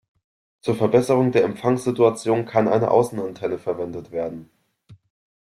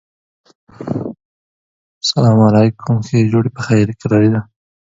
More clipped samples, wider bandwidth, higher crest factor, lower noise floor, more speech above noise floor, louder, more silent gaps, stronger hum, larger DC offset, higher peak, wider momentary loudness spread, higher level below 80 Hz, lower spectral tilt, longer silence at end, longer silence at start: neither; first, 13.5 kHz vs 7.8 kHz; about the same, 18 dB vs 14 dB; second, -51 dBFS vs under -90 dBFS; second, 31 dB vs over 78 dB; second, -21 LUFS vs -14 LUFS; second, none vs 1.25-2.01 s; neither; neither; second, -4 dBFS vs 0 dBFS; about the same, 11 LU vs 13 LU; second, -60 dBFS vs -48 dBFS; about the same, -7 dB/octave vs -7 dB/octave; about the same, 0.5 s vs 0.45 s; second, 0.65 s vs 0.8 s